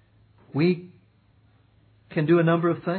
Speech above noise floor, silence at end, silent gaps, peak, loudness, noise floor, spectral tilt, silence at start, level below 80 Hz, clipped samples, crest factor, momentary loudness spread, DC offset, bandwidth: 38 dB; 0 s; none; -10 dBFS; -23 LUFS; -60 dBFS; -11.5 dB/octave; 0.55 s; -68 dBFS; under 0.1%; 16 dB; 12 LU; under 0.1%; 4.5 kHz